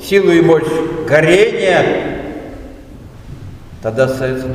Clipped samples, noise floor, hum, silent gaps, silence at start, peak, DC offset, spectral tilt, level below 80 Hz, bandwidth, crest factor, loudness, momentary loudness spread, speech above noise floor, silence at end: under 0.1%; -34 dBFS; none; none; 0 s; 0 dBFS; under 0.1%; -6 dB/octave; -38 dBFS; 15.5 kHz; 14 dB; -13 LUFS; 23 LU; 22 dB; 0 s